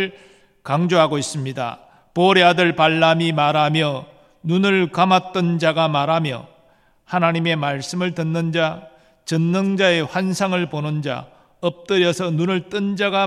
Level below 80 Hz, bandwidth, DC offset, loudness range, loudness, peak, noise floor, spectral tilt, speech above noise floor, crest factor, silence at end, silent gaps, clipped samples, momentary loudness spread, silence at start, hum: -62 dBFS; 12.5 kHz; under 0.1%; 5 LU; -19 LUFS; -2 dBFS; -56 dBFS; -5.5 dB/octave; 37 dB; 18 dB; 0 s; none; under 0.1%; 11 LU; 0 s; none